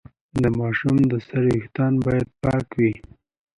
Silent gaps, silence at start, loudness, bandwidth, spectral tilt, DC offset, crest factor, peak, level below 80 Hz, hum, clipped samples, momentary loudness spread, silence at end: none; 0.35 s; -22 LUFS; 11 kHz; -9 dB/octave; under 0.1%; 14 dB; -6 dBFS; -44 dBFS; none; under 0.1%; 4 LU; 0.55 s